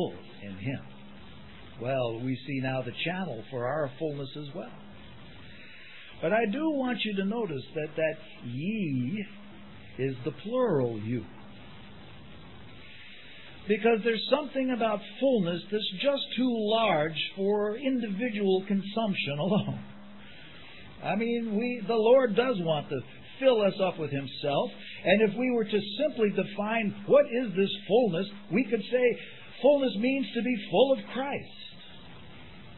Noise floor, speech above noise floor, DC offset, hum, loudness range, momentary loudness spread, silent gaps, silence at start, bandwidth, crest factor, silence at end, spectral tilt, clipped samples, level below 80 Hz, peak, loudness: -49 dBFS; 21 dB; 0.4%; none; 7 LU; 24 LU; none; 0 s; 4.3 kHz; 20 dB; 0 s; -9.5 dB/octave; under 0.1%; -66 dBFS; -8 dBFS; -29 LUFS